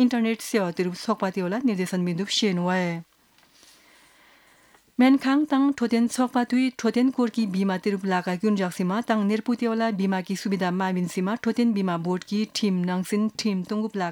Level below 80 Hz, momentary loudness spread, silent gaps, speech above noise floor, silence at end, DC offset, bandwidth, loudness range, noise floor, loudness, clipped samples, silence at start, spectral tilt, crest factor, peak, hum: -72 dBFS; 5 LU; none; 35 dB; 0 s; under 0.1%; 18.5 kHz; 4 LU; -59 dBFS; -24 LUFS; under 0.1%; 0 s; -5.5 dB/octave; 16 dB; -8 dBFS; none